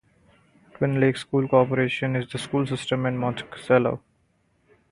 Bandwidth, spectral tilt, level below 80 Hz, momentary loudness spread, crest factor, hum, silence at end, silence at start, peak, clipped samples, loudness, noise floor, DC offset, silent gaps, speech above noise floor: 11.5 kHz; -6.5 dB/octave; -58 dBFS; 8 LU; 20 dB; none; 0.95 s; 0.8 s; -4 dBFS; under 0.1%; -24 LUFS; -67 dBFS; under 0.1%; none; 43 dB